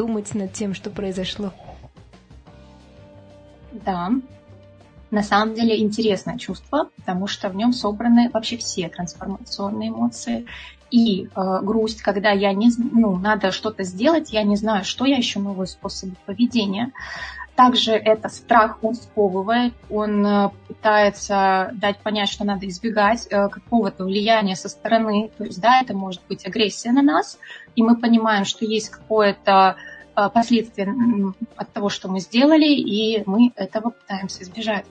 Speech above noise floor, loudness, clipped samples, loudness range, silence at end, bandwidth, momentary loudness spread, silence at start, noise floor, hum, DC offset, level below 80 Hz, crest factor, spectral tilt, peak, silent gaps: 27 dB; -20 LUFS; under 0.1%; 5 LU; 0.1 s; 9.2 kHz; 12 LU; 0 s; -47 dBFS; none; under 0.1%; -52 dBFS; 18 dB; -5 dB/octave; -2 dBFS; none